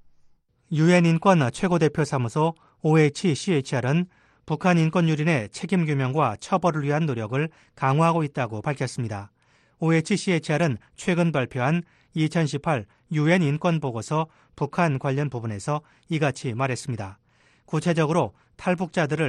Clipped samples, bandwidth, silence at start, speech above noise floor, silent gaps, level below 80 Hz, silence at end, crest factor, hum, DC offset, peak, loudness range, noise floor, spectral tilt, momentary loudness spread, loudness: under 0.1%; 11 kHz; 0.7 s; 35 dB; none; -60 dBFS; 0 s; 20 dB; none; under 0.1%; -4 dBFS; 5 LU; -58 dBFS; -6.5 dB/octave; 10 LU; -24 LUFS